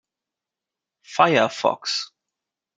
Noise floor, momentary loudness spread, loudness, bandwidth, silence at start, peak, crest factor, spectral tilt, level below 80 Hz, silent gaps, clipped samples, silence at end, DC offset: -87 dBFS; 13 LU; -21 LUFS; 9.4 kHz; 1.1 s; -2 dBFS; 24 dB; -3.5 dB/octave; -72 dBFS; none; under 0.1%; 0.7 s; under 0.1%